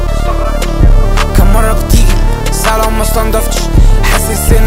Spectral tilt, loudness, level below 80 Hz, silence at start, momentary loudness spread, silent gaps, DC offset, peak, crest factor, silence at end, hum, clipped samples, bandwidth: -5 dB/octave; -11 LUFS; -8 dBFS; 0 s; 4 LU; none; under 0.1%; 0 dBFS; 8 dB; 0 s; none; under 0.1%; 16.5 kHz